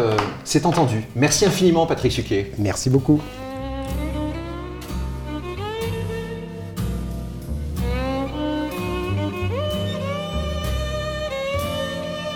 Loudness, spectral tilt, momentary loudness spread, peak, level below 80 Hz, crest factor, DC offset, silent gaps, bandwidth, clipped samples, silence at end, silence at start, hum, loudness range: -23 LUFS; -5 dB/octave; 12 LU; -4 dBFS; -34 dBFS; 18 dB; under 0.1%; none; 19 kHz; under 0.1%; 0 s; 0 s; none; 9 LU